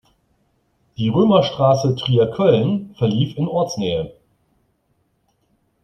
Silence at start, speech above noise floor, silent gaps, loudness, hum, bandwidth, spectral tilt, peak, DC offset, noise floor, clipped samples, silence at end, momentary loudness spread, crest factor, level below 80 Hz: 1 s; 49 dB; none; -18 LUFS; none; 9 kHz; -7 dB/octave; -2 dBFS; under 0.1%; -66 dBFS; under 0.1%; 1.7 s; 9 LU; 18 dB; -54 dBFS